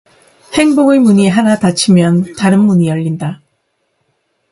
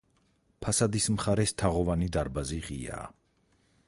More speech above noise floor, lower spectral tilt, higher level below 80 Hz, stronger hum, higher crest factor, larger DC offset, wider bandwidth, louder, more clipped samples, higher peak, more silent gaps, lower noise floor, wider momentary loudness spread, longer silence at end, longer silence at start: first, 54 dB vs 40 dB; about the same, -6 dB/octave vs -5 dB/octave; second, -50 dBFS vs -44 dBFS; neither; second, 12 dB vs 18 dB; neither; about the same, 11.5 kHz vs 11.5 kHz; first, -11 LUFS vs -30 LUFS; neither; first, 0 dBFS vs -12 dBFS; neither; second, -64 dBFS vs -69 dBFS; about the same, 10 LU vs 12 LU; first, 1.15 s vs 0.8 s; about the same, 0.5 s vs 0.6 s